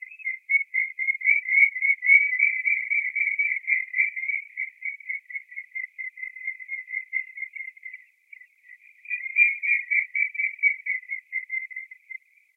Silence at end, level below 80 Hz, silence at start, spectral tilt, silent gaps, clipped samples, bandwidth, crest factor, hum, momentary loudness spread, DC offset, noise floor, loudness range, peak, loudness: 0.4 s; under -90 dBFS; 0 s; 5 dB/octave; none; under 0.1%; 2.9 kHz; 20 dB; none; 17 LU; under 0.1%; -52 dBFS; 13 LU; -6 dBFS; -23 LUFS